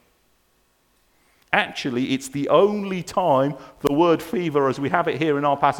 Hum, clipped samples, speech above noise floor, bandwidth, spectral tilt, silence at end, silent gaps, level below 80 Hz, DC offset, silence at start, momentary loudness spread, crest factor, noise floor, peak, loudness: none; under 0.1%; 43 dB; 19 kHz; -5.5 dB/octave; 0 s; none; -58 dBFS; under 0.1%; 1.5 s; 7 LU; 22 dB; -64 dBFS; 0 dBFS; -21 LUFS